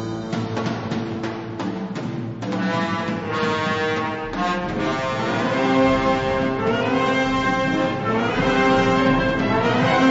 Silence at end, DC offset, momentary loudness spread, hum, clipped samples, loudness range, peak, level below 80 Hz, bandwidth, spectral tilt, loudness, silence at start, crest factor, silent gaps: 0 s; under 0.1%; 10 LU; none; under 0.1%; 6 LU; -6 dBFS; -42 dBFS; 8 kHz; -6 dB/octave; -21 LUFS; 0 s; 16 dB; none